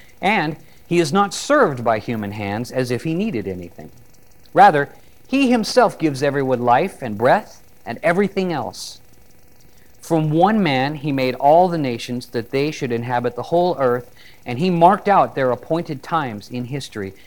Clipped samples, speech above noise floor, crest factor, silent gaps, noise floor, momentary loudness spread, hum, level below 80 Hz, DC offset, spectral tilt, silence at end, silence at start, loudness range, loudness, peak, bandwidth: under 0.1%; 33 dB; 18 dB; none; -51 dBFS; 13 LU; none; -54 dBFS; 0.7%; -6 dB/octave; 0.15 s; 0.2 s; 4 LU; -19 LUFS; -2 dBFS; 18 kHz